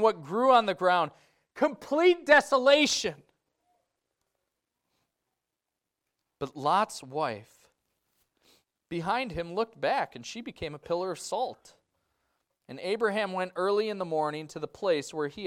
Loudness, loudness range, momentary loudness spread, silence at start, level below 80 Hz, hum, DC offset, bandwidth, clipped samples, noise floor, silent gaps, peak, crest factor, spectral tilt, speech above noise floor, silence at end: -27 LUFS; 10 LU; 17 LU; 0 s; -66 dBFS; none; under 0.1%; 15.5 kHz; under 0.1%; -87 dBFS; none; -8 dBFS; 22 dB; -3.5 dB/octave; 59 dB; 0 s